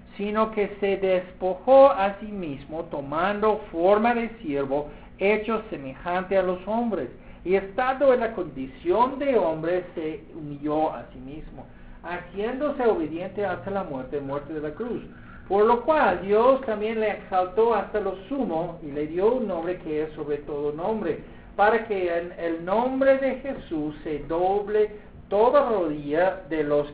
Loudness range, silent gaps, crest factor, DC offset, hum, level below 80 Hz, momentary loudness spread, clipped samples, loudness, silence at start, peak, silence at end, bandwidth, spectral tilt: 6 LU; none; 20 dB; 0.1%; none; -50 dBFS; 13 LU; under 0.1%; -25 LUFS; 0.05 s; -4 dBFS; 0 s; 4 kHz; -10 dB/octave